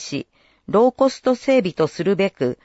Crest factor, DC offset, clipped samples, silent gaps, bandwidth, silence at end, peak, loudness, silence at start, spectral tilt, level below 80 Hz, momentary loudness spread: 16 dB; under 0.1%; under 0.1%; none; 8 kHz; 0.1 s; -4 dBFS; -19 LUFS; 0 s; -6 dB/octave; -58 dBFS; 5 LU